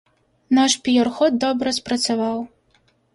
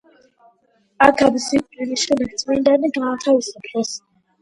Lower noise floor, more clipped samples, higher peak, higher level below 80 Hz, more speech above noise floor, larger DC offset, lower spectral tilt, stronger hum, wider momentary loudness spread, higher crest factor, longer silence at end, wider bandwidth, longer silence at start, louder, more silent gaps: about the same, -61 dBFS vs -61 dBFS; neither; second, -4 dBFS vs 0 dBFS; second, -60 dBFS vs -54 dBFS; about the same, 42 dB vs 43 dB; neither; about the same, -3 dB/octave vs -3 dB/octave; neither; second, 8 LU vs 11 LU; about the same, 18 dB vs 20 dB; first, 0.65 s vs 0.45 s; about the same, 11.5 kHz vs 11.5 kHz; second, 0.5 s vs 1 s; about the same, -19 LUFS vs -18 LUFS; neither